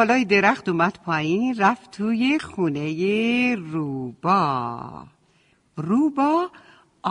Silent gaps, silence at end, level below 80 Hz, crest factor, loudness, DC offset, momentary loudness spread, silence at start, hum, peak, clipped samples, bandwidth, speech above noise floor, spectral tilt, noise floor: none; 0 s; -62 dBFS; 18 dB; -22 LUFS; under 0.1%; 13 LU; 0 s; none; -4 dBFS; under 0.1%; 10.5 kHz; 40 dB; -6 dB/octave; -62 dBFS